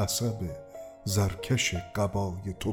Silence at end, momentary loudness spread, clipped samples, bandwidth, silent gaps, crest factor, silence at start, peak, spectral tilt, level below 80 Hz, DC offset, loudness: 0 s; 11 LU; under 0.1%; 19 kHz; none; 16 dB; 0 s; -14 dBFS; -4.5 dB/octave; -48 dBFS; under 0.1%; -30 LUFS